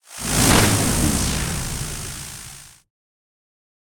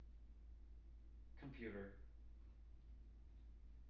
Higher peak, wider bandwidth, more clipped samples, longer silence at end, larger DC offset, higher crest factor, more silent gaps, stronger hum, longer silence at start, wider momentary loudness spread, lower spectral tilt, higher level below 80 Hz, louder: first, -2 dBFS vs -40 dBFS; first, 19.5 kHz vs 5.8 kHz; neither; first, 1.2 s vs 0 s; neither; about the same, 20 dB vs 18 dB; neither; neither; about the same, 0.1 s vs 0 s; first, 18 LU vs 12 LU; second, -3.5 dB/octave vs -7 dB/octave; first, -32 dBFS vs -60 dBFS; first, -19 LUFS vs -60 LUFS